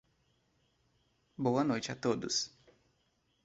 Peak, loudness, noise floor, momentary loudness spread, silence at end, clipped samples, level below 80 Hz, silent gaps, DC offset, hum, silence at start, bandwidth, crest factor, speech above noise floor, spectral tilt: -18 dBFS; -34 LUFS; -76 dBFS; 5 LU; 0.95 s; under 0.1%; -74 dBFS; none; under 0.1%; none; 1.4 s; 8 kHz; 20 dB; 43 dB; -4.5 dB/octave